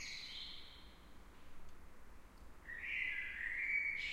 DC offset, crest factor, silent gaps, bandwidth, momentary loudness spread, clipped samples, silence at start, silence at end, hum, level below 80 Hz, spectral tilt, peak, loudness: under 0.1%; 18 dB; none; 16 kHz; 26 LU; under 0.1%; 0 s; 0 s; none; -60 dBFS; -1.5 dB/octave; -28 dBFS; -41 LUFS